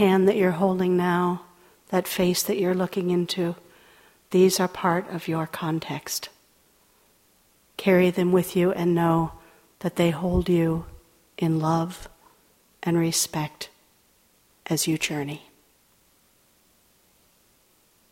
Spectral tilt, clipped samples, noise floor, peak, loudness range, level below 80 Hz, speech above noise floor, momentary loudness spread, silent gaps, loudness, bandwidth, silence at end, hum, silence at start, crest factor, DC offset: -5 dB/octave; under 0.1%; -62 dBFS; -6 dBFS; 8 LU; -50 dBFS; 39 dB; 13 LU; none; -24 LUFS; 16.5 kHz; 2.75 s; none; 0 s; 20 dB; under 0.1%